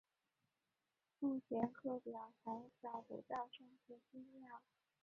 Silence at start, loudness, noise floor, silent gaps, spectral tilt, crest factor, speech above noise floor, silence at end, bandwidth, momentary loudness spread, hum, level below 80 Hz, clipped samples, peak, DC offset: 1.2 s; -48 LUFS; under -90 dBFS; none; -5.5 dB/octave; 22 dB; over 42 dB; 0.45 s; 7 kHz; 18 LU; none; -86 dBFS; under 0.1%; -28 dBFS; under 0.1%